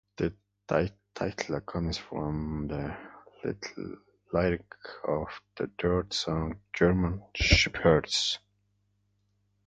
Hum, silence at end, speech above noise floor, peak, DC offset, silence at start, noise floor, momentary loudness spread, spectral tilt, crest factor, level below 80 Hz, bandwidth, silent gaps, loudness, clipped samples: 50 Hz at -55 dBFS; 1.3 s; 44 dB; -6 dBFS; under 0.1%; 0.2 s; -73 dBFS; 15 LU; -5 dB/octave; 24 dB; -42 dBFS; 9.4 kHz; none; -30 LUFS; under 0.1%